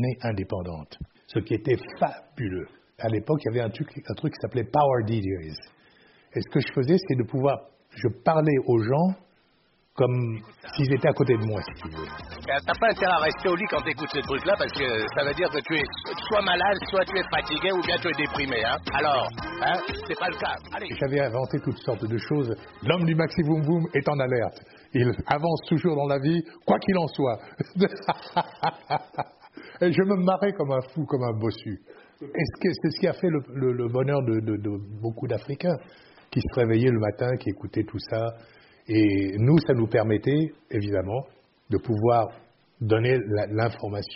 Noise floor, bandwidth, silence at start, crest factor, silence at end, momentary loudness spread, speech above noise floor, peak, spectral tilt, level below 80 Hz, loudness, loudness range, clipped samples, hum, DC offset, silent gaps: -65 dBFS; 5.8 kHz; 0 s; 18 dB; 0 s; 11 LU; 40 dB; -6 dBFS; -5 dB/octave; -52 dBFS; -26 LUFS; 3 LU; under 0.1%; none; under 0.1%; none